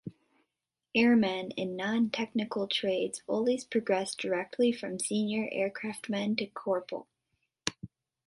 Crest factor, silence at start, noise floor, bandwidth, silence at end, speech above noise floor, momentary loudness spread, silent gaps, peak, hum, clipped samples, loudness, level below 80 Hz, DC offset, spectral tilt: 22 dB; 0.05 s; -87 dBFS; 11.5 kHz; 0.4 s; 57 dB; 10 LU; none; -8 dBFS; none; under 0.1%; -31 LUFS; -70 dBFS; under 0.1%; -4 dB/octave